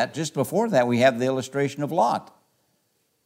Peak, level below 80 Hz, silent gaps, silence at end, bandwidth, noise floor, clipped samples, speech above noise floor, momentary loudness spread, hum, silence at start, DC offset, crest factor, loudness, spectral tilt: -6 dBFS; -76 dBFS; none; 1 s; 16 kHz; -70 dBFS; under 0.1%; 48 dB; 7 LU; none; 0 s; under 0.1%; 18 dB; -23 LUFS; -5.5 dB/octave